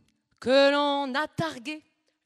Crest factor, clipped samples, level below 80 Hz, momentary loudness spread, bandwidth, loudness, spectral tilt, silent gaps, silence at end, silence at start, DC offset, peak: 16 dB; under 0.1%; -70 dBFS; 17 LU; 12 kHz; -25 LUFS; -4.5 dB/octave; none; 0.45 s; 0.4 s; under 0.1%; -10 dBFS